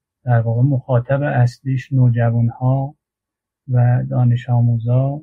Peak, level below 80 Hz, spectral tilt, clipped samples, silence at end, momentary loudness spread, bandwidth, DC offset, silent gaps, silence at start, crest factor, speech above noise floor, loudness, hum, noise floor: -4 dBFS; -50 dBFS; -10 dB/octave; under 0.1%; 0 s; 4 LU; 4.8 kHz; under 0.1%; none; 0.25 s; 12 dB; 69 dB; -17 LUFS; none; -84 dBFS